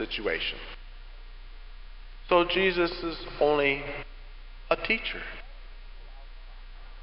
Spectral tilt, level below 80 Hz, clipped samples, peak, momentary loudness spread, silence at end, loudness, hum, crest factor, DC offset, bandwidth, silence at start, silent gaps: -8.5 dB/octave; -44 dBFS; under 0.1%; -8 dBFS; 26 LU; 0 s; -27 LUFS; none; 22 dB; under 0.1%; 5.8 kHz; 0 s; none